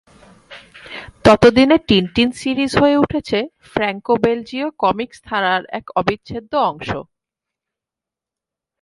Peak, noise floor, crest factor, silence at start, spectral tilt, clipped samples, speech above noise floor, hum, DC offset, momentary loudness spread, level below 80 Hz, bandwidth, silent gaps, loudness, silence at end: 0 dBFS; -87 dBFS; 18 dB; 0.5 s; -5.5 dB/octave; under 0.1%; 71 dB; none; under 0.1%; 15 LU; -44 dBFS; 11.5 kHz; none; -17 LUFS; 1.8 s